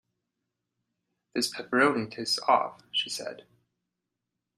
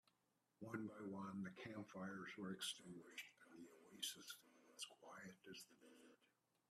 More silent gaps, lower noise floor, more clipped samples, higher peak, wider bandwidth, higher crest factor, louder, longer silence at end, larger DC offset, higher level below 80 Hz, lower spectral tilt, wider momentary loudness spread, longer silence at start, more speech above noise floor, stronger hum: neither; about the same, -85 dBFS vs -87 dBFS; neither; first, -8 dBFS vs -34 dBFS; about the same, 15 kHz vs 15 kHz; about the same, 22 dB vs 22 dB; first, -28 LUFS vs -54 LUFS; first, 1.2 s vs 0.45 s; neither; first, -76 dBFS vs under -90 dBFS; about the same, -2.5 dB/octave vs -3.5 dB/octave; second, 11 LU vs 14 LU; first, 1.35 s vs 0.6 s; first, 57 dB vs 33 dB; neither